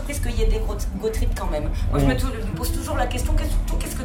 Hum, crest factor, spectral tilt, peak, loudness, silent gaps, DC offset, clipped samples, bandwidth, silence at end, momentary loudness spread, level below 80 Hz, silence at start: none; 16 dB; -5.5 dB/octave; -6 dBFS; -25 LUFS; none; under 0.1%; under 0.1%; 17 kHz; 0 s; 5 LU; -24 dBFS; 0 s